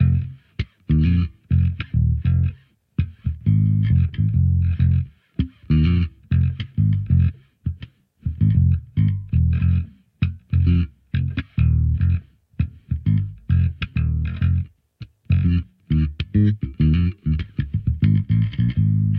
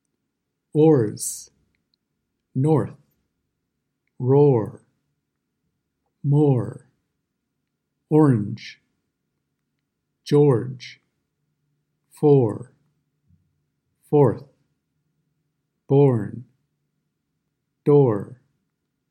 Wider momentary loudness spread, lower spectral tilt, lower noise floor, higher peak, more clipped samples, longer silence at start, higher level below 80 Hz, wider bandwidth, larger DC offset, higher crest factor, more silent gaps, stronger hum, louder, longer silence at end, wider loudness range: second, 9 LU vs 19 LU; first, -10.5 dB/octave vs -8 dB/octave; second, -42 dBFS vs -78 dBFS; about the same, -6 dBFS vs -4 dBFS; neither; second, 0 s vs 0.75 s; first, -28 dBFS vs -70 dBFS; second, 4.5 kHz vs 13.5 kHz; neither; second, 14 dB vs 20 dB; neither; neither; about the same, -21 LUFS vs -20 LUFS; second, 0 s vs 0.75 s; about the same, 2 LU vs 3 LU